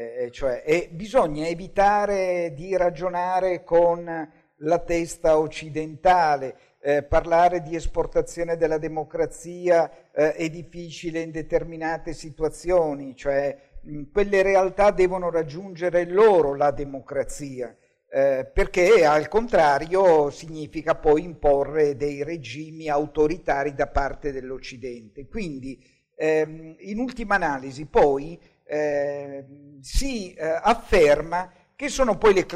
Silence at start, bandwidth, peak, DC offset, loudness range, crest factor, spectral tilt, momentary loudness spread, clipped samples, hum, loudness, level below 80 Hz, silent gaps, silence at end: 0 s; 13 kHz; -10 dBFS; under 0.1%; 7 LU; 14 dB; -5.5 dB/octave; 15 LU; under 0.1%; none; -23 LUFS; -38 dBFS; none; 0 s